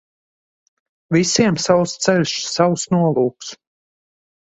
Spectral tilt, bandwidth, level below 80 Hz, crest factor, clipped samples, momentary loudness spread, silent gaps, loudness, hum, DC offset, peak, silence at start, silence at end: -4.5 dB/octave; 8.2 kHz; -56 dBFS; 20 dB; under 0.1%; 6 LU; none; -17 LUFS; none; under 0.1%; 0 dBFS; 1.1 s; 0.95 s